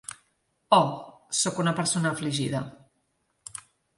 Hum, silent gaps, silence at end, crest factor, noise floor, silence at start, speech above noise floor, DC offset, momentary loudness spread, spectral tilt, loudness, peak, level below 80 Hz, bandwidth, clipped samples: none; none; 0.4 s; 22 dB; -73 dBFS; 0.1 s; 48 dB; under 0.1%; 20 LU; -4 dB/octave; -26 LUFS; -6 dBFS; -66 dBFS; 11.5 kHz; under 0.1%